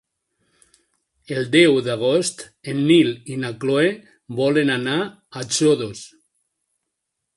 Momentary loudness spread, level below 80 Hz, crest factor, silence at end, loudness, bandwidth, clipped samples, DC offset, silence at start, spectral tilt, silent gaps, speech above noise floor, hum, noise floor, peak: 16 LU; -64 dBFS; 20 dB; 1.3 s; -19 LUFS; 11.5 kHz; under 0.1%; under 0.1%; 1.3 s; -4.5 dB/octave; none; 60 dB; none; -79 dBFS; -2 dBFS